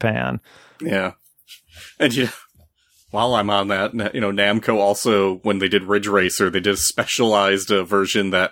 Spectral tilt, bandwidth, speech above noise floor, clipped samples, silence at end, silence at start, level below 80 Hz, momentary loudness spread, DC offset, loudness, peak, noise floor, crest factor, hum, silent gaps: -3.5 dB/octave; 18 kHz; 38 dB; under 0.1%; 0 s; 0 s; -54 dBFS; 7 LU; under 0.1%; -19 LUFS; -2 dBFS; -57 dBFS; 18 dB; none; none